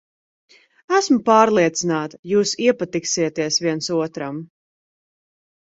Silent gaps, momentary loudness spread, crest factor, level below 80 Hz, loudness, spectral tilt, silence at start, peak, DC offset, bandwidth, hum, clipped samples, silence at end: 2.19-2.23 s; 11 LU; 20 dB; -64 dBFS; -19 LUFS; -4 dB/octave; 0.9 s; 0 dBFS; under 0.1%; 8 kHz; none; under 0.1%; 1.2 s